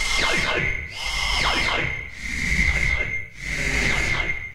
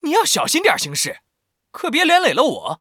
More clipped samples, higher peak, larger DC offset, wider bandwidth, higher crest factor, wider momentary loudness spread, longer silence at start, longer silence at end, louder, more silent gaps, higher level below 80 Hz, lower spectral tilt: neither; second, -6 dBFS vs 0 dBFS; neither; second, 16 kHz vs over 20 kHz; about the same, 16 dB vs 18 dB; about the same, 7 LU vs 8 LU; about the same, 0 s vs 0.05 s; about the same, 0 s vs 0.05 s; second, -22 LUFS vs -16 LUFS; neither; first, -32 dBFS vs -68 dBFS; about the same, -2.5 dB/octave vs -2 dB/octave